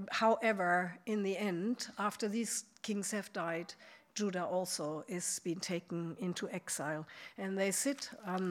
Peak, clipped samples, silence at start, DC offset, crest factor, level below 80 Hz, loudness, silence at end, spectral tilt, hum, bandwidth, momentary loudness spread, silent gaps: -18 dBFS; under 0.1%; 0 s; under 0.1%; 18 dB; -90 dBFS; -37 LUFS; 0 s; -3.5 dB/octave; none; 17 kHz; 10 LU; none